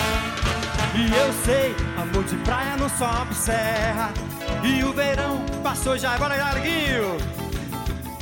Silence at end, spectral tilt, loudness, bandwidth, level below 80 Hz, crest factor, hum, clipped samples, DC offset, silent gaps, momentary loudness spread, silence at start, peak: 0 s; -4.5 dB/octave; -23 LUFS; 17 kHz; -32 dBFS; 18 dB; none; under 0.1%; under 0.1%; none; 8 LU; 0 s; -6 dBFS